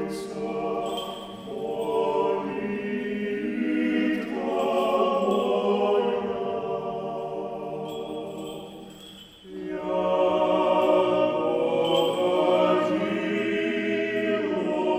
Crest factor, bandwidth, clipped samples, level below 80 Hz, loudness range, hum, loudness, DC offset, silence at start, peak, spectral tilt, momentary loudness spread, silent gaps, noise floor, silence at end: 16 dB; 15.5 kHz; under 0.1%; -62 dBFS; 8 LU; none; -25 LUFS; under 0.1%; 0 s; -8 dBFS; -6 dB/octave; 13 LU; none; -46 dBFS; 0 s